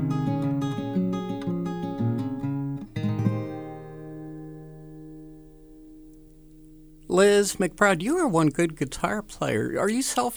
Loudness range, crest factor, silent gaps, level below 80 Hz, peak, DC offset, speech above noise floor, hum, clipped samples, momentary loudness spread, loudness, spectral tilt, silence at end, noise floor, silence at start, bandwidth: 17 LU; 22 dB; none; -52 dBFS; -4 dBFS; under 0.1%; 26 dB; none; under 0.1%; 20 LU; -25 LUFS; -5.5 dB/octave; 0 s; -49 dBFS; 0 s; over 20 kHz